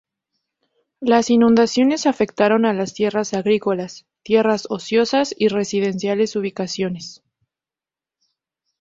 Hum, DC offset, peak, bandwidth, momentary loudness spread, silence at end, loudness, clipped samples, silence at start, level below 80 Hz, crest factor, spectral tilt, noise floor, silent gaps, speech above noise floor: none; under 0.1%; -2 dBFS; 7.8 kHz; 11 LU; 1.65 s; -19 LUFS; under 0.1%; 1 s; -60 dBFS; 18 dB; -5 dB/octave; under -90 dBFS; none; over 72 dB